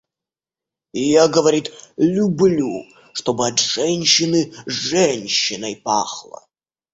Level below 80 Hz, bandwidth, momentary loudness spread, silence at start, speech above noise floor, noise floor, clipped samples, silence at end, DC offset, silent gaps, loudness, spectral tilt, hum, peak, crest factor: -58 dBFS; 8 kHz; 12 LU; 0.95 s; 71 dB; -89 dBFS; under 0.1%; 0.7 s; under 0.1%; none; -18 LUFS; -3.5 dB/octave; none; 0 dBFS; 18 dB